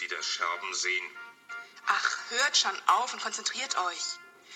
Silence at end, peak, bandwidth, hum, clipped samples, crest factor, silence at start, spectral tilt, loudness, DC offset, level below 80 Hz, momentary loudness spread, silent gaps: 0 s; -8 dBFS; 17 kHz; none; under 0.1%; 24 dB; 0 s; 2.5 dB/octave; -29 LUFS; under 0.1%; under -90 dBFS; 18 LU; none